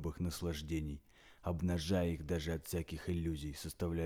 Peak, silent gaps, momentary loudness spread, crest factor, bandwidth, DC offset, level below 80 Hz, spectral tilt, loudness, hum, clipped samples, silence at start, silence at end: -24 dBFS; none; 8 LU; 16 dB; 17 kHz; under 0.1%; -50 dBFS; -6 dB/octave; -40 LUFS; none; under 0.1%; 0 s; 0 s